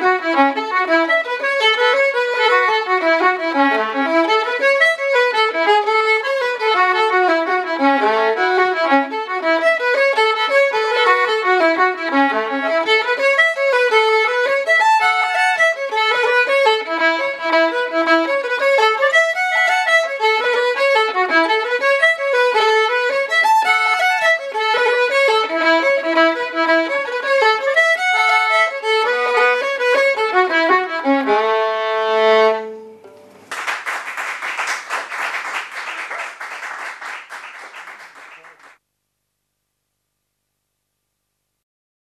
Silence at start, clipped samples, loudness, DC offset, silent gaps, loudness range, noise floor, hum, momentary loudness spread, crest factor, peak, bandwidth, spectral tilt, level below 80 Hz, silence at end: 0 s; under 0.1%; -15 LUFS; under 0.1%; none; 9 LU; -74 dBFS; 50 Hz at -75 dBFS; 9 LU; 16 dB; 0 dBFS; 13.5 kHz; -1 dB/octave; -84 dBFS; 3.65 s